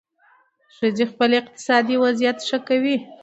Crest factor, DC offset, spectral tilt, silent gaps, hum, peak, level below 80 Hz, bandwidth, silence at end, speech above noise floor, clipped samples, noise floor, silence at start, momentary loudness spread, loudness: 18 dB; under 0.1%; -4 dB/octave; none; none; -4 dBFS; -70 dBFS; 8.2 kHz; 0.05 s; 38 dB; under 0.1%; -58 dBFS; 0.8 s; 5 LU; -20 LUFS